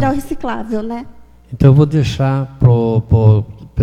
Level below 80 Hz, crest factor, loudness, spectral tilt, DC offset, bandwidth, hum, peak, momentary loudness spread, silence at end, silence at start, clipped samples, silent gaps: -32 dBFS; 14 dB; -14 LUFS; -8.5 dB/octave; under 0.1%; 11 kHz; none; 0 dBFS; 15 LU; 0 s; 0 s; under 0.1%; none